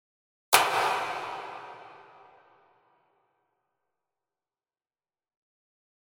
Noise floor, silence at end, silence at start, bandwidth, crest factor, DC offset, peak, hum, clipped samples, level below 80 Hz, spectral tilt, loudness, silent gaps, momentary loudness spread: under -90 dBFS; 4.05 s; 0.5 s; 16 kHz; 32 dB; under 0.1%; -2 dBFS; none; under 0.1%; -78 dBFS; 0 dB/octave; -26 LUFS; none; 23 LU